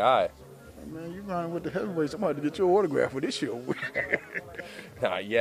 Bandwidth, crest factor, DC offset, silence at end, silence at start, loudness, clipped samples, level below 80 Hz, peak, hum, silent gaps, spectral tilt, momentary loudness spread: 15 kHz; 20 dB; under 0.1%; 0 s; 0 s; -29 LUFS; under 0.1%; -62 dBFS; -8 dBFS; none; none; -5.5 dB/octave; 17 LU